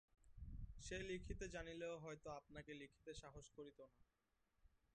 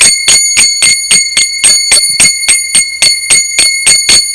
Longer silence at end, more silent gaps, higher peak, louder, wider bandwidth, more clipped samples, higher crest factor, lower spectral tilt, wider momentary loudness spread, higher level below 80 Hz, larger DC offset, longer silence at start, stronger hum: first, 0.25 s vs 0 s; neither; second, -36 dBFS vs 0 dBFS; second, -55 LUFS vs -4 LUFS; second, 9.6 kHz vs 11 kHz; second, under 0.1% vs 4%; first, 18 dB vs 8 dB; first, -4.5 dB/octave vs 2.5 dB/octave; first, 10 LU vs 3 LU; second, -62 dBFS vs -40 dBFS; neither; first, 0.2 s vs 0 s; neither